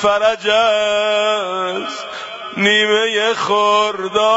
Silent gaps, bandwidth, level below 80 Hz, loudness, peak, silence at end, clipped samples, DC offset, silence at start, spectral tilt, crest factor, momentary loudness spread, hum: none; 8 kHz; -56 dBFS; -15 LUFS; -2 dBFS; 0 s; under 0.1%; under 0.1%; 0 s; -2.5 dB/octave; 14 dB; 12 LU; none